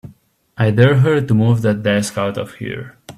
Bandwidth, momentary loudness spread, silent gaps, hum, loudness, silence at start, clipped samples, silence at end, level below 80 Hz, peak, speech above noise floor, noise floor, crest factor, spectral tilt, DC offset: 13.5 kHz; 15 LU; none; none; -16 LUFS; 0.05 s; under 0.1%; 0.05 s; -50 dBFS; 0 dBFS; 33 dB; -47 dBFS; 16 dB; -7 dB/octave; under 0.1%